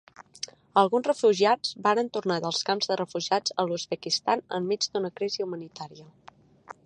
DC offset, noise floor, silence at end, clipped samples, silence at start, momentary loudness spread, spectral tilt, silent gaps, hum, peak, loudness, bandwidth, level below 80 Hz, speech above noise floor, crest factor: under 0.1%; -49 dBFS; 0.15 s; under 0.1%; 0.2 s; 15 LU; -3.5 dB/octave; none; none; -6 dBFS; -26 LUFS; 10 kHz; -76 dBFS; 23 dB; 22 dB